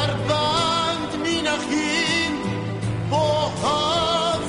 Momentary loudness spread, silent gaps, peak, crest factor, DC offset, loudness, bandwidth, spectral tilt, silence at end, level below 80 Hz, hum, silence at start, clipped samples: 6 LU; none; -8 dBFS; 14 dB; under 0.1%; -21 LUFS; 10.5 kHz; -4 dB/octave; 0 s; -46 dBFS; none; 0 s; under 0.1%